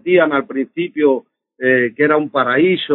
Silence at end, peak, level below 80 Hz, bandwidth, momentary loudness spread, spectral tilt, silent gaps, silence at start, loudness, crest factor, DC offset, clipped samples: 0 s; -2 dBFS; -70 dBFS; 4.2 kHz; 8 LU; -3.5 dB/octave; none; 0.05 s; -16 LUFS; 14 dB; under 0.1%; under 0.1%